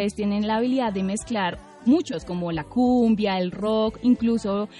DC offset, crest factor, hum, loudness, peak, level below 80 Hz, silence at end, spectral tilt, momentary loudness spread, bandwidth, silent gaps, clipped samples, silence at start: under 0.1%; 12 dB; none; -23 LUFS; -10 dBFS; -50 dBFS; 0 s; -6 dB/octave; 8 LU; 11 kHz; none; under 0.1%; 0 s